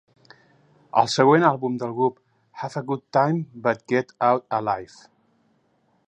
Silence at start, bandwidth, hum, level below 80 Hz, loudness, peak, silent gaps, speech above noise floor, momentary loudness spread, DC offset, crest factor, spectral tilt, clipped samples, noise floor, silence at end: 0.95 s; 10 kHz; none; -68 dBFS; -22 LUFS; -2 dBFS; none; 44 dB; 12 LU; under 0.1%; 22 dB; -6 dB/octave; under 0.1%; -66 dBFS; 1.2 s